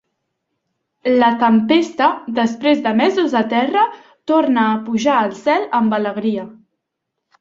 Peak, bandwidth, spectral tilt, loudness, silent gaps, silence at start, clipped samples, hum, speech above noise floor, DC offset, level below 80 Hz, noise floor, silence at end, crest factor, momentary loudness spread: -2 dBFS; 7.6 kHz; -5.5 dB/octave; -16 LUFS; none; 1.05 s; under 0.1%; none; 62 dB; under 0.1%; -62 dBFS; -77 dBFS; 0.9 s; 16 dB; 7 LU